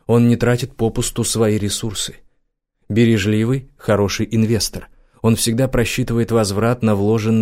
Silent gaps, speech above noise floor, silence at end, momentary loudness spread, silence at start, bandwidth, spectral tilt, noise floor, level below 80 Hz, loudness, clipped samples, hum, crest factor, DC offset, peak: none; 50 dB; 0 s; 7 LU; 0.1 s; 16 kHz; -5.5 dB/octave; -67 dBFS; -38 dBFS; -18 LUFS; under 0.1%; none; 14 dB; under 0.1%; -4 dBFS